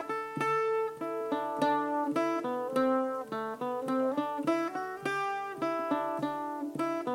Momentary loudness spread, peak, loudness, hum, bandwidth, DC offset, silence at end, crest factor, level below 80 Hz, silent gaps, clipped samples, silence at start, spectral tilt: 6 LU; -16 dBFS; -32 LUFS; none; 16.5 kHz; under 0.1%; 0 s; 16 dB; -76 dBFS; none; under 0.1%; 0 s; -5.5 dB/octave